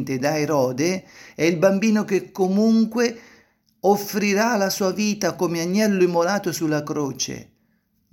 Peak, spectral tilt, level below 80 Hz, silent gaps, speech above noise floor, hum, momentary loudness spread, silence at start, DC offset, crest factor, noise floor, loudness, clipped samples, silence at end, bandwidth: -4 dBFS; -5 dB/octave; -64 dBFS; none; 45 dB; none; 7 LU; 0 s; under 0.1%; 18 dB; -66 dBFS; -21 LUFS; under 0.1%; 0.7 s; 17 kHz